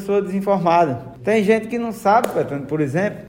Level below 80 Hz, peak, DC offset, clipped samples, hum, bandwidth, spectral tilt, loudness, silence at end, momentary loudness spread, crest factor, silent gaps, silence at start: -54 dBFS; -4 dBFS; under 0.1%; under 0.1%; none; 16 kHz; -7 dB/octave; -19 LUFS; 0 s; 7 LU; 14 dB; none; 0 s